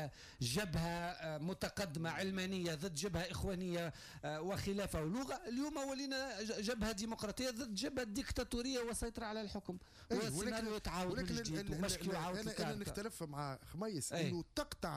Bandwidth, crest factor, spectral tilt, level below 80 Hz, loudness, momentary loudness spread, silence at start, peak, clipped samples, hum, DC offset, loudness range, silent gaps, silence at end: 15.5 kHz; 14 dB; -4.5 dB/octave; -56 dBFS; -42 LUFS; 5 LU; 0 s; -28 dBFS; under 0.1%; none; under 0.1%; 1 LU; none; 0 s